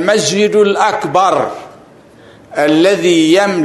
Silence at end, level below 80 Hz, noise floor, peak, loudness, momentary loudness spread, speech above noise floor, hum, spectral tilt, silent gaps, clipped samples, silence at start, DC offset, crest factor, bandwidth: 0 s; -56 dBFS; -40 dBFS; 0 dBFS; -11 LUFS; 9 LU; 29 dB; none; -4 dB/octave; none; under 0.1%; 0 s; under 0.1%; 12 dB; 12.5 kHz